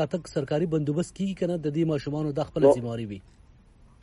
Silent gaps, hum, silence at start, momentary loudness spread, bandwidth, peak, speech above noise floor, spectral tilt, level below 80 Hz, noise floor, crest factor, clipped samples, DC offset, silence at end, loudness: none; none; 0 s; 12 LU; 11.5 kHz; -6 dBFS; 28 dB; -7.5 dB/octave; -54 dBFS; -55 dBFS; 20 dB; under 0.1%; under 0.1%; 0.8 s; -27 LUFS